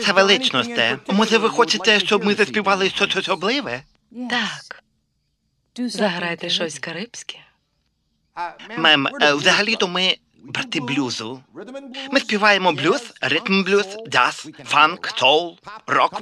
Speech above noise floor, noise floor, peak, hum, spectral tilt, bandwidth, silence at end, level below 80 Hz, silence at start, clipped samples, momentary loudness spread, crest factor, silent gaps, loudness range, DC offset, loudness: 50 dB; -70 dBFS; 0 dBFS; none; -3 dB/octave; 13 kHz; 0 s; -66 dBFS; 0 s; under 0.1%; 17 LU; 20 dB; none; 8 LU; under 0.1%; -18 LUFS